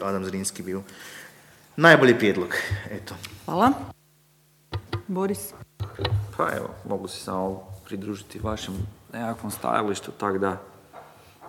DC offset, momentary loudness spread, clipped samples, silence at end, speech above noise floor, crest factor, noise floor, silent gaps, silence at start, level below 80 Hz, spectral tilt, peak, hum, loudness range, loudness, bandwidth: under 0.1%; 19 LU; under 0.1%; 0 s; 35 dB; 26 dB; -60 dBFS; none; 0 s; -52 dBFS; -5 dB/octave; 0 dBFS; none; 9 LU; -25 LUFS; 18.5 kHz